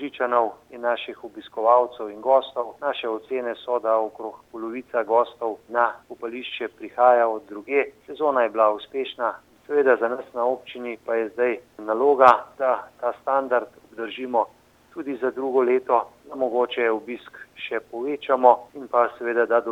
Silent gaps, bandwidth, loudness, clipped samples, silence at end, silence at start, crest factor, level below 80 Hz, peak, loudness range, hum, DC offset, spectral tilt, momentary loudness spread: none; 8 kHz; -23 LUFS; under 0.1%; 0 s; 0 s; 24 dB; -70 dBFS; 0 dBFS; 4 LU; none; under 0.1%; -5 dB/octave; 15 LU